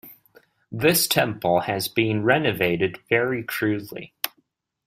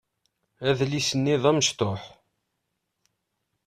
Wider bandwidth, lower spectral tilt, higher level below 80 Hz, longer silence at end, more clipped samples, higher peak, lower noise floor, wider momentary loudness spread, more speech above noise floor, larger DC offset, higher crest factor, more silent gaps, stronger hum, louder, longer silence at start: first, 16 kHz vs 14 kHz; about the same, -4 dB/octave vs -4 dB/octave; about the same, -60 dBFS vs -62 dBFS; second, 0.6 s vs 1.6 s; neither; first, 0 dBFS vs -6 dBFS; second, -69 dBFS vs -79 dBFS; first, 12 LU vs 8 LU; second, 46 dB vs 55 dB; neither; about the same, 24 dB vs 22 dB; neither; neither; about the same, -22 LUFS vs -24 LUFS; second, 0.05 s vs 0.6 s